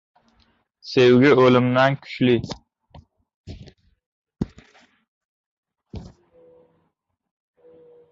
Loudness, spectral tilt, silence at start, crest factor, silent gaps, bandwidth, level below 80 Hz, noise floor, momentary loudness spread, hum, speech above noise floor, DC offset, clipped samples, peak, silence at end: -17 LUFS; -7 dB/octave; 0.85 s; 20 dB; 3.34-3.44 s, 4.06-4.22 s, 5.08-5.63 s; 7.4 kHz; -52 dBFS; -73 dBFS; 28 LU; none; 56 dB; under 0.1%; under 0.1%; -4 dBFS; 2.1 s